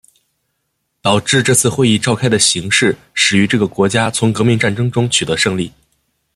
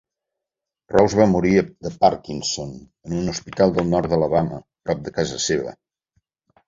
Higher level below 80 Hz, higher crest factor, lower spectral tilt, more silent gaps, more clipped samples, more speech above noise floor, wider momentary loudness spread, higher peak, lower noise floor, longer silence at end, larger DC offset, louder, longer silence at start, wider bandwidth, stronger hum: about the same, -50 dBFS vs -46 dBFS; about the same, 16 dB vs 20 dB; second, -3.5 dB/octave vs -5.5 dB/octave; neither; neither; second, 56 dB vs 66 dB; second, 5 LU vs 13 LU; about the same, 0 dBFS vs -2 dBFS; second, -70 dBFS vs -86 dBFS; second, 0.65 s vs 0.95 s; neither; first, -13 LUFS vs -21 LUFS; first, 1.05 s vs 0.9 s; first, 13.5 kHz vs 7.8 kHz; neither